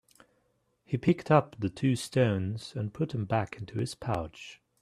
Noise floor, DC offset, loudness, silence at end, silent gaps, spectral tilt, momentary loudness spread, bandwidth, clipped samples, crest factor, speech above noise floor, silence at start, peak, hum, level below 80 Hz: -73 dBFS; under 0.1%; -30 LUFS; 0.3 s; none; -7 dB/octave; 11 LU; 14 kHz; under 0.1%; 22 dB; 44 dB; 0.9 s; -8 dBFS; none; -60 dBFS